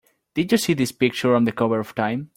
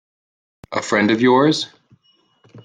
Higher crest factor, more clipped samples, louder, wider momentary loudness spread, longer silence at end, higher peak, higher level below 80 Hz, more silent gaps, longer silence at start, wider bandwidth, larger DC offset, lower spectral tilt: about the same, 18 dB vs 16 dB; neither; second, -21 LUFS vs -17 LUFS; second, 6 LU vs 13 LU; about the same, 0.1 s vs 0.05 s; about the same, -4 dBFS vs -4 dBFS; about the same, -60 dBFS vs -62 dBFS; neither; second, 0.35 s vs 0.7 s; first, 16.5 kHz vs 9.6 kHz; neither; about the same, -5.5 dB/octave vs -5 dB/octave